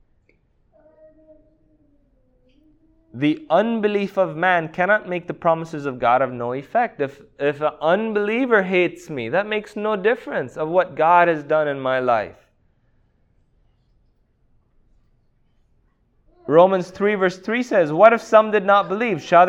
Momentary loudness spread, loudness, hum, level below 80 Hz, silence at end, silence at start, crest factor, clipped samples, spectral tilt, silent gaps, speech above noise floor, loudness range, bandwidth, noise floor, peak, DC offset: 10 LU; -19 LUFS; none; -60 dBFS; 0 s; 3.15 s; 20 dB; under 0.1%; -6.5 dB/octave; none; 43 dB; 8 LU; 8.6 kHz; -62 dBFS; 0 dBFS; under 0.1%